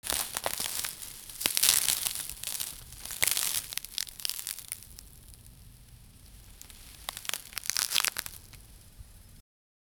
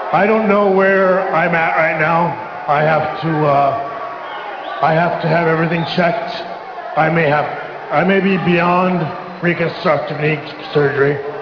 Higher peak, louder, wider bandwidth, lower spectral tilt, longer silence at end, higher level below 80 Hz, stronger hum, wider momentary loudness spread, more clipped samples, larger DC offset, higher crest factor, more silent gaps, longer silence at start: about the same, -2 dBFS vs -2 dBFS; second, -30 LUFS vs -15 LUFS; first, over 20 kHz vs 5.4 kHz; second, 1 dB/octave vs -8 dB/octave; first, 0.6 s vs 0 s; about the same, -56 dBFS vs -54 dBFS; neither; first, 24 LU vs 11 LU; neither; neither; first, 34 dB vs 14 dB; neither; about the same, 0.05 s vs 0 s